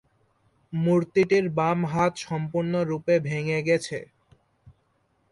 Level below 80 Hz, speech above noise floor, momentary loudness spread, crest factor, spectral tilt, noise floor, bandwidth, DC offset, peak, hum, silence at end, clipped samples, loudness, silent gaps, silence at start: -62 dBFS; 45 dB; 8 LU; 16 dB; -6.5 dB/octave; -69 dBFS; 11.5 kHz; under 0.1%; -10 dBFS; none; 0.6 s; under 0.1%; -25 LUFS; none; 0.7 s